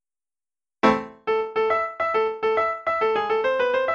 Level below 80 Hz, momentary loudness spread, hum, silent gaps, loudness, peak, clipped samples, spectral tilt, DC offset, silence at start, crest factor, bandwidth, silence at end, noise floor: -60 dBFS; 3 LU; none; none; -23 LUFS; -4 dBFS; under 0.1%; -5.5 dB/octave; under 0.1%; 0.85 s; 18 dB; 7.6 kHz; 0 s; under -90 dBFS